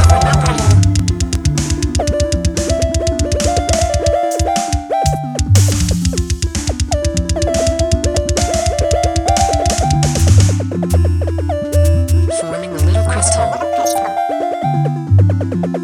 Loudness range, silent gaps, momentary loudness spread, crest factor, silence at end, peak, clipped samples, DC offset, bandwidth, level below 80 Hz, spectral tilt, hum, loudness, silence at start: 2 LU; none; 6 LU; 14 dB; 0 s; 0 dBFS; under 0.1%; under 0.1%; 15 kHz; -22 dBFS; -5 dB/octave; none; -15 LUFS; 0 s